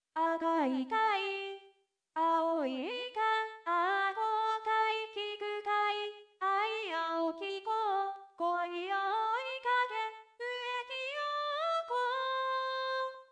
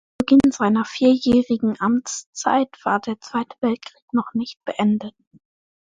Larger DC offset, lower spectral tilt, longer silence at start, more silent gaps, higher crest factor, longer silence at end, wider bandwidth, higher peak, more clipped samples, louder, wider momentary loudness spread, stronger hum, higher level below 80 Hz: neither; second, -2 dB/octave vs -5 dB/octave; about the same, 0.15 s vs 0.2 s; second, none vs 2.26-2.33 s, 4.02-4.08 s; about the same, 14 dB vs 16 dB; second, 0.05 s vs 0.85 s; about the same, 10 kHz vs 9.4 kHz; second, -20 dBFS vs -4 dBFS; neither; second, -34 LUFS vs -21 LUFS; second, 7 LU vs 12 LU; neither; second, under -90 dBFS vs -56 dBFS